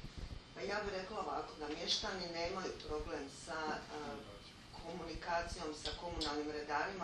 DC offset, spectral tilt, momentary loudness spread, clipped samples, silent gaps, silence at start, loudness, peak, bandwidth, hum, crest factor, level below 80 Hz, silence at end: under 0.1%; -3.5 dB/octave; 13 LU; under 0.1%; none; 0 s; -42 LUFS; -22 dBFS; 12 kHz; none; 20 dB; -56 dBFS; 0 s